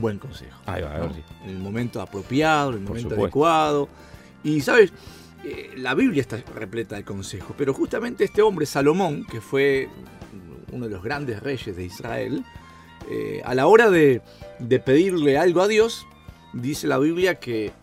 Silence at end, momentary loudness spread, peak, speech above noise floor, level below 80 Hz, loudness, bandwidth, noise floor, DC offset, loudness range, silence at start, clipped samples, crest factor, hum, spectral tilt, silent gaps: 0.1 s; 18 LU; 0 dBFS; 21 dB; -50 dBFS; -22 LUFS; 15.5 kHz; -43 dBFS; under 0.1%; 8 LU; 0 s; under 0.1%; 22 dB; none; -6 dB/octave; none